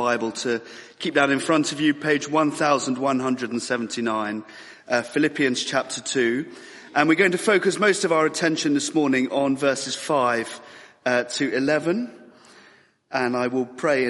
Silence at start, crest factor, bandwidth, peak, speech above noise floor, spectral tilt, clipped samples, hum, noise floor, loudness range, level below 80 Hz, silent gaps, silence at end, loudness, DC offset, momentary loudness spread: 0 s; 22 dB; 11.5 kHz; -2 dBFS; 32 dB; -4 dB/octave; under 0.1%; none; -55 dBFS; 4 LU; -68 dBFS; none; 0 s; -22 LUFS; under 0.1%; 10 LU